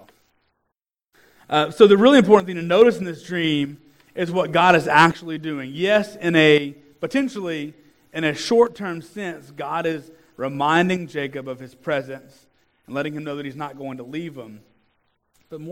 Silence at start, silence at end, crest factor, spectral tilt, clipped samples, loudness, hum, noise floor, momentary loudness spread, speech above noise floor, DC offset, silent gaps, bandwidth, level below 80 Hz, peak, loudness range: 1.5 s; 0 s; 20 dB; -5.5 dB/octave; under 0.1%; -19 LUFS; none; -79 dBFS; 19 LU; 60 dB; under 0.1%; none; 15.5 kHz; -64 dBFS; 0 dBFS; 13 LU